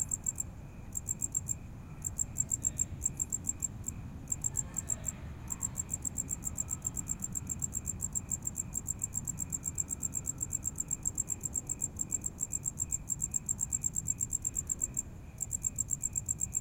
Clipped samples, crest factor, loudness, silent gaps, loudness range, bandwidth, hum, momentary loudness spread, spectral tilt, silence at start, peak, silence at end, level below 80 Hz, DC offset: under 0.1%; 20 dB; -34 LUFS; none; 2 LU; 17 kHz; none; 6 LU; -3.5 dB/octave; 0 s; -16 dBFS; 0 s; -50 dBFS; under 0.1%